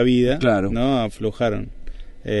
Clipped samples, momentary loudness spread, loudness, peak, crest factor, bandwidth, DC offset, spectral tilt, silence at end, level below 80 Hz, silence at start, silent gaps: under 0.1%; 14 LU; -21 LUFS; -4 dBFS; 16 dB; 11.5 kHz; under 0.1%; -7 dB/octave; 0 s; -34 dBFS; 0 s; none